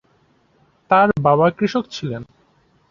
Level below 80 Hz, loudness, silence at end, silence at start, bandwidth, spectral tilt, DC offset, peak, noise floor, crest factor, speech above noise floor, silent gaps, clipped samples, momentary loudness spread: -54 dBFS; -17 LUFS; 0.7 s; 0.9 s; 7.4 kHz; -7 dB/octave; under 0.1%; 0 dBFS; -59 dBFS; 20 dB; 42 dB; none; under 0.1%; 13 LU